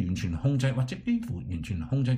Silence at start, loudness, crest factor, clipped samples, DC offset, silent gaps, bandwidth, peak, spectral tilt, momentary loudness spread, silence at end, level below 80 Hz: 0 s; -30 LUFS; 14 dB; under 0.1%; under 0.1%; none; 10.5 kHz; -14 dBFS; -7.5 dB/octave; 8 LU; 0 s; -46 dBFS